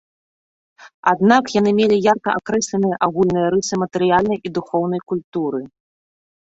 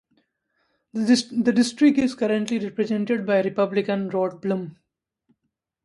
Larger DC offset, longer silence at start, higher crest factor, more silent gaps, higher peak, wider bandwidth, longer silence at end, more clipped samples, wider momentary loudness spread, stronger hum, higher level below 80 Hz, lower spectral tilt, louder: neither; second, 0.8 s vs 0.95 s; about the same, 18 dB vs 16 dB; first, 0.94-1.03 s, 5.24-5.32 s vs none; first, -2 dBFS vs -6 dBFS; second, 8 kHz vs 11.5 kHz; second, 0.8 s vs 1.1 s; neither; about the same, 9 LU vs 9 LU; neither; first, -54 dBFS vs -64 dBFS; about the same, -5.5 dB/octave vs -5.5 dB/octave; first, -18 LUFS vs -22 LUFS